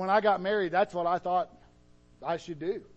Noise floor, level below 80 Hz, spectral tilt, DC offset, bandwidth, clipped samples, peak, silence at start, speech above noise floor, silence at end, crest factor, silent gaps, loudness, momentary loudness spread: -59 dBFS; -62 dBFS; -6 dB/octave; under 0.1%; 8.4 kHz; under 0.1%; -12 dBFS; 0 s; 30 dB; 0.15 s; 18 dB; none; -29 LUFS; 10 LU